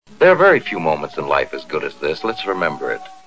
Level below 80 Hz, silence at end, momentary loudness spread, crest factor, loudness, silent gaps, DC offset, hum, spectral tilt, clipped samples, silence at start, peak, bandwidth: -52 dBFS; 0.15 s; 12 LU; 18 dB; -18 LUFS; none; 0.7%; none; -6 dB/octave; under 0.1%; 0.1 s; 0 dBFS; 8 kHz